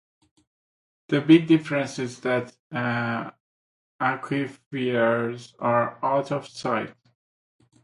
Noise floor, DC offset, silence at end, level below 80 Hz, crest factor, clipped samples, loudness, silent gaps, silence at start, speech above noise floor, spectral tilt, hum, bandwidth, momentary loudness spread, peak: under -90 dBFS; under 0.1%; 0.95 s; -68 dBFS; 22 dB; under 0.1%; -25 LUFS; 2.59-2.70 s, 3.40-3.99 s, 4.66-4.71 s; 1.1 s; over 66 dB; -6.5 dB/octave; none; 11.5 kHz; 13 LU; -4 dBFS